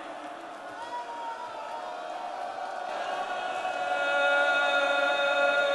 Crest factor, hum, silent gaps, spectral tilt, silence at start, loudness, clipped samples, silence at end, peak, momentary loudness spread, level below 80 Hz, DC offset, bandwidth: 16 dB; none; none; -1.5 dB/octave; 0 s; -28 LUFS; under 0.1%; 0 s; -12 dBFS; 15 LU; -78 dBFS; under 0.1%; 11.5 kHz